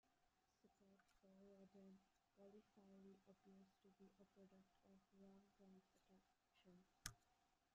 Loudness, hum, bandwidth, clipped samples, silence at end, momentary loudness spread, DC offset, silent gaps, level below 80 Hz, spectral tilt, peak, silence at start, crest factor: -63 LUFS; none; 7.2 kHz; under 0.1%; 0 s; 10 LU; under 0.1%; none; -84 dBFS; -4 dB/octave; -30 dBFS; 0.05 s; 40 dB